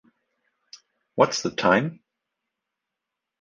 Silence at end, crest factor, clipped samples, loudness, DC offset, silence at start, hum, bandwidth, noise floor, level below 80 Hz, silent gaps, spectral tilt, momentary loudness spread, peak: 1.5 s; 24 dB; under 0.1%; -22 LUFS; under 0.1%; 1.15 s; none; 9.8 kHz; -85 dBFS; -64 dBFS; none; -4.5 dB/octave; 12 LU; -4 dBFS